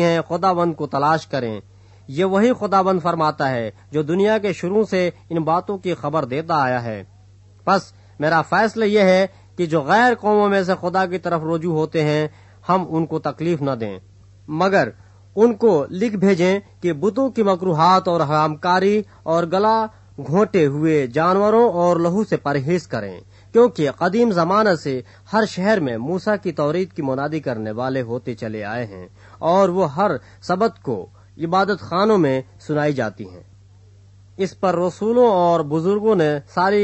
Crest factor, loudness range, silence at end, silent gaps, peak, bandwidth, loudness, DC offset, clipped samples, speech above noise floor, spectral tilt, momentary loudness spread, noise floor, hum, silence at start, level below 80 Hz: 16 dB; 4 LU; 0 s; none; -2 dBFS; 8.4 kHz; -19 LUFS; under 0.1%; under 0.1%; 29 dB; -7 dB/octave; 11 LU; -47 dBFS; none; 0 s; -58 dBFS